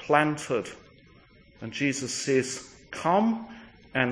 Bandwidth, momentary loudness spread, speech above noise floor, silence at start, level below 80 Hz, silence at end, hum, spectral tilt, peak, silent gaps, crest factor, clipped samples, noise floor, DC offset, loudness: 10.5 kHz; 17 LU; 29 dB; 0 s; -62 dBFS; 0 s; none; -4.5 dB/octave; -4 dBFS; none; 24 dB; under 0.1%; -56 dBFS; under 0.1%; -28 LUFS